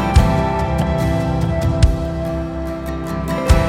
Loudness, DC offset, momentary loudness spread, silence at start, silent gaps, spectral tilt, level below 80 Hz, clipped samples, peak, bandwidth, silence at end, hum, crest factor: -19 LUFS; under 0.1%; 9 LU; 0 s; none; -7 dB/octave; -22 dBFS; under 0.1%; 0 dBFS; 15.5 kHz; 0 s; none; 16 dB